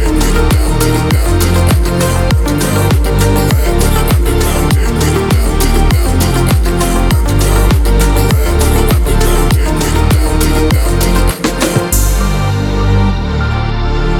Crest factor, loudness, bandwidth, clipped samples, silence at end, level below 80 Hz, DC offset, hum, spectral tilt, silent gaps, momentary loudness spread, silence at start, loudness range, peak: 10 dB; -12 LUFS; 19 kHz; under 0.1%; 0 s; -12 dBFS; under 0.1%; none; -5.5 dB/octave; none; 3 LU; 0 s; 1 LU; 0 dBFS